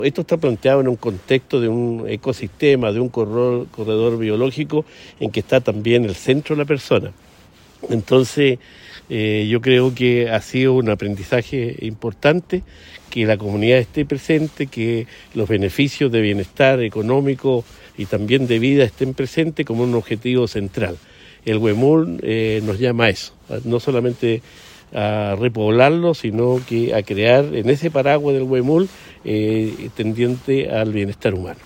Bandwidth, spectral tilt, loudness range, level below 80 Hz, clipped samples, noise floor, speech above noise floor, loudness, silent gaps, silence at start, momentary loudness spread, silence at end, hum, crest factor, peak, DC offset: 16.5 kHz; -7 dB/octave; 3 LU; -48 dBFS; under 0.1%; -48 dBFS; 30 dB; -18 LUFS; none; 0 s; 10 LU; 0.1 s; none; 18 dB; 0 dBFS; under 0.1%